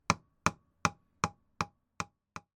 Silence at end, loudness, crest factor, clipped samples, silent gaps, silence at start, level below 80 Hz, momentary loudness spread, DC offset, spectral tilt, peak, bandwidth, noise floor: 0.2 s; -36 LUFS; 30 dB; under 0.1%; none; 0.1 s; -60 dBFS; 9 LU; under 0.1%; -3.5 dB/octave; -8 dBFS; 17.5 kHz; -53 dBFS